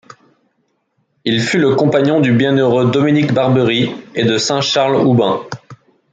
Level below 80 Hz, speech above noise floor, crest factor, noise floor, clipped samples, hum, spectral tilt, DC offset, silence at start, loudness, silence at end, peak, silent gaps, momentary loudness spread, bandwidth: -56 dBFS; 52 dB; 14 dB; -65 dBFS; under 0.1%; none; -5.5 dB/octave; under 0.1%; 1.25 s; -14 LUFS; 0.4 s; -2 dBFS; none; 6 LU; 9.2 kHz